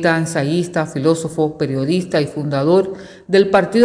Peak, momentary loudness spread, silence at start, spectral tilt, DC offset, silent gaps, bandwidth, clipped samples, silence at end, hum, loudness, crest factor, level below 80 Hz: -2 dBFS; 6 LU; 0 s; -6 dB/octave; under 0.1%; none; 10.5 kHz; under 0.1%; 0 s; none; -17 LUFS; 14 dB; -54 dBFS